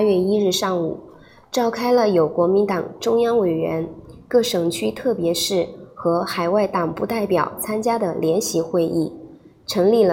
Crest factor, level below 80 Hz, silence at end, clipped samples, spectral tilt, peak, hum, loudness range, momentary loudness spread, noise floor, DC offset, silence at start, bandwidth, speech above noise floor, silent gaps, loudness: 14 dB; -56 dBFS; 0 s; under 0.1%; -5 dB/octave; -6 dBFS; none; 2 LU; 8 LU; -43 dBFS; under 0.1%; 0 s; 17 kHz; 23 dB; none; -20 LUFS